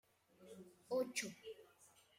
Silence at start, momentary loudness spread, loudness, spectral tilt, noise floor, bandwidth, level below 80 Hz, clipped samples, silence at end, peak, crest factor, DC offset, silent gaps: 0.4 s; 25 LU; -44 LUFS; -2.5 dB/octave; -70 dBFS; 16 kHz; -90 dBFS; under 0.1%; 0.3 s; -28 dBFS; 20 dB; under 0.1%; none